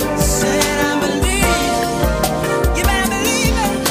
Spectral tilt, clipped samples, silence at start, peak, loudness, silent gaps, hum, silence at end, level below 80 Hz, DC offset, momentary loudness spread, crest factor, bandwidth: -4 dB/octave; under 0.1%; 0 s; -2 dBFS; -16 LUFS; none; none; 0 s; -24 dBFS; under 0.1%; 2 LU; 14 dB; 15.5 kHz